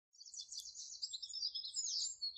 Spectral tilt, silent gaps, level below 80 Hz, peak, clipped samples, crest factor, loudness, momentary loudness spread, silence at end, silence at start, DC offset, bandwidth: 4.5 dB/octave; none; -86 dBFS; -30 dBFS; under 0.1%; 16 dB; -42 LUFS; 10 LU; 0 s; 0.15 s; under 0.1%; 10 kHz